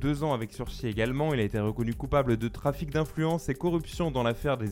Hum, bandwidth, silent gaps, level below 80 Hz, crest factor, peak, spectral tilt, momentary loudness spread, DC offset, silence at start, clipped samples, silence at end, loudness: none; 17 kHz; none; -42 dBFS; 16 dB; -12 dBFS; -7 dB/octave; 5 LU; under 0.1%; 0 s; under 0.1%; 0 s; -29 LUFS